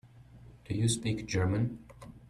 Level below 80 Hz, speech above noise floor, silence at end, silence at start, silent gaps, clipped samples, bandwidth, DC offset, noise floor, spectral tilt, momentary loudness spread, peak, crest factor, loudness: -56 dBFS; 23 dB; 0 s; 0.05 s; none; under 0.1%; 13 kHz; under 0.1%; -54 dBFS; -5.5 dB/octave; 14 LU; -18 dBFS; 16 dB; -32 LUFS